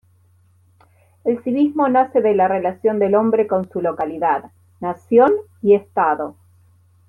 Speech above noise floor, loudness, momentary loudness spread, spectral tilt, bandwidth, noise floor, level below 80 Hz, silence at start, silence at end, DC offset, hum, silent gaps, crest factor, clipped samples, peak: 38 dB; -18 LUFS; 10 LU; -9 dB/octave; 3.8 kHz; -55 dBFS; -64 dBFS; 1.25 s; 0.8 s; under 0.1%; none; none; 16 dB; under 0.1%; -2 dBFS